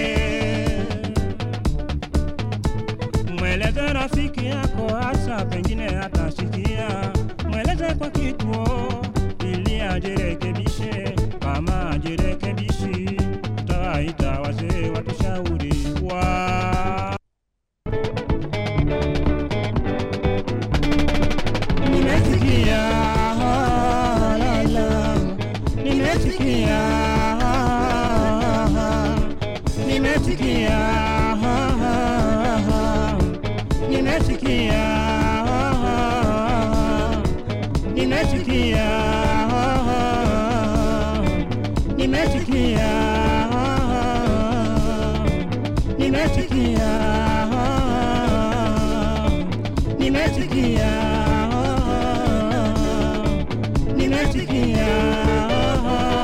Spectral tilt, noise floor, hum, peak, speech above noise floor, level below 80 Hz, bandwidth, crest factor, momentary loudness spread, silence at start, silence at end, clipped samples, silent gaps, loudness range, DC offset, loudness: -6.5 dB/octave; -76 dBFS; none; -4 dBFS; 54 dB; -26 dBFS; 14.5 kHz; 14 dB; 6 LU; 0 s; 0 s; under 0.1%; none; 4 LU; under 0.1%; -21 LUFS